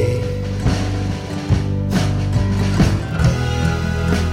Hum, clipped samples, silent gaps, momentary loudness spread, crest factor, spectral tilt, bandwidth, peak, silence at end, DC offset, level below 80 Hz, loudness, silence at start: none; under 0.1%; none; 5 LU; 14 dB; -6.5 dB/octave; 14 kHz; -2 dBFS; 0 s; under 0.1%; -26 dBFS; -19 LUFS; 0 s